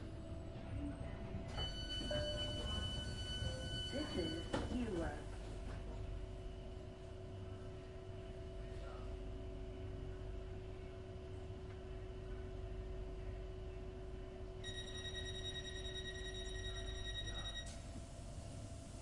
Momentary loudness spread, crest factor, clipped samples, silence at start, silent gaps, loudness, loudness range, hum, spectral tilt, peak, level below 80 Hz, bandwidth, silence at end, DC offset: 10 LU; 22 dB; under 0.1%; 0 s; none; -47 LUFS; 8 LU; none; -5 dB/octave; -24 dBFS; -50 dBFS; 11.5 kHz; 0 s; under 0.1%